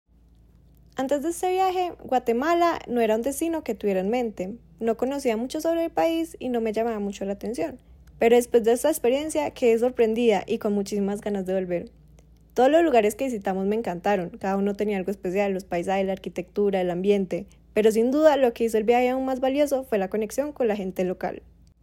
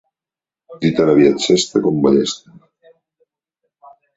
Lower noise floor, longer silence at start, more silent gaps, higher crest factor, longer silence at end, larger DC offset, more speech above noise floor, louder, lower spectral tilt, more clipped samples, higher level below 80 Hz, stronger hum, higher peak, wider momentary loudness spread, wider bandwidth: second, -55 dBFS vs -90 dBFS; first, 0.95 s vs 0.7 s; neither; about the same, 18 dB vs 16 dB; second, 0.45 s vs 1.8 s; neither; second, 32 dB vs 75 dB; second, -24 LUFS vs -15 LUFS; about the same, -5.5 dB/octave vs -5 dB/octave; neither; about the same, -54 dBFS vs -56 dBFS; neither; second, -6 dBFS vs -2 dBFS; about the same, 10 LU vs 9 LU; first, 16.5 kHz vs 8 kHz